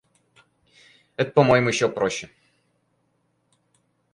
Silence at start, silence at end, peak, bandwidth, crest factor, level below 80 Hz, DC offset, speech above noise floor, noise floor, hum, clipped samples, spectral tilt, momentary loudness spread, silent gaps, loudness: 1.2 s; 1.85 s; -4 dBFS; 11.5 kHz; 22 dB; -60 dBFS; under 0.1%; 49 dB; -70 dBFS; none; under 0.1%; -5 dB/octave; 19 LU; none; -21 LUFS